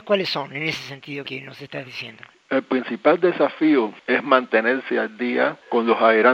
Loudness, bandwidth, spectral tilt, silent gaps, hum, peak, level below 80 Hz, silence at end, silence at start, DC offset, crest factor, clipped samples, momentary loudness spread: -21 LUFS; 8.2 kHz; -5.5 dB/octave; none; none; 0 dBFS; -72 dBFS; 0 s; 0.05 s; under 0.1%; 20 dB; under 0.1%; 15 LU